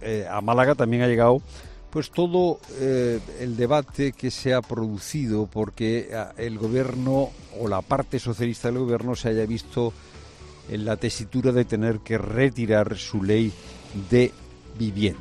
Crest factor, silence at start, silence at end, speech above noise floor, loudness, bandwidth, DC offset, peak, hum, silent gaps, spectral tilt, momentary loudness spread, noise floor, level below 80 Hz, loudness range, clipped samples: 18 dB; 0 s; 0 s; 21 dB; -24 LUFS; 13.5 kHz; under 0.1%; -6 dBFS; none; none; -6.5 dB/octave; 11 LU; -44 dBFS; -46 dBFS; 4 LU; under 0.1%